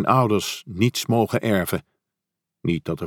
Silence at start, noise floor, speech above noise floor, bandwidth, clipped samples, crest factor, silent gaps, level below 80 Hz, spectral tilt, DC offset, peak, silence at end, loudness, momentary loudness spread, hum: 0 s; -84 dBFS; 63 dB; 18.5 kHz; under 0.1%; 20 dB; none; -54 dBFS; -5.5 dB/octave; under 0.1%; -4 dBFS; 0 s; -23 LUFS; 10 LU; none